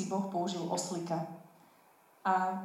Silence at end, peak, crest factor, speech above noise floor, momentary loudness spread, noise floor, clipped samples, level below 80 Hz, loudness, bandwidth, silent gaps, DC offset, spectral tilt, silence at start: 0 s; -16 dBFS; 18 dB; 30 dB; 9 LU; -64 dBFS; under 0.1%; -84 dBFS; -35 LUFS; 16 kHz; none; under 0.1%; -4.5 dB/octave; 0 s